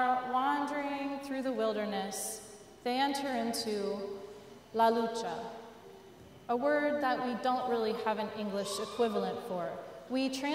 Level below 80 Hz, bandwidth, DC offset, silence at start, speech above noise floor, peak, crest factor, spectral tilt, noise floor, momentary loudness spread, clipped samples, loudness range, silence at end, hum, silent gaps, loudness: -72 dBFS; 16 kHz; under 0.1%; 0 s; 21 dB; -16 dBFS; 18 dB; -4 dB/octave; -54 dBFS; 15 LU; under 0.1%; 2 LU; 0 s; none; none; -34 LUFS